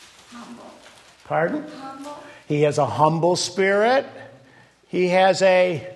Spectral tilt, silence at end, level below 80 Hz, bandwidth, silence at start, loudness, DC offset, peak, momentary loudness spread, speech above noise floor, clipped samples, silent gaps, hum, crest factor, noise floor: -5 dB/octave; 0 s; -68 dBFS; 12 kHz; 0.3 s; -20 LUFS; under 0.1%; -2 dBFS; 22 LU; 32 dB; under 0.1%; none; none; 20 dB; -52 dBFS